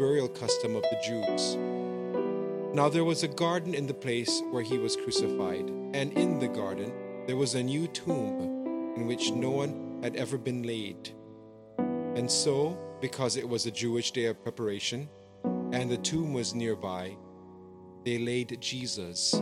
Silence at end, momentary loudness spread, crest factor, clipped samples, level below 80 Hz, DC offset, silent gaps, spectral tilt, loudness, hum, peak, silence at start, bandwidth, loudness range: 0 s; 10 LU; 20 dB; under 0.1%; -72 dBFS; under 0.1%; none; -4.5 dB/octave; -31 LUFS; none; -10 dBFS; 0 s; 14.5 kHz; 4 LU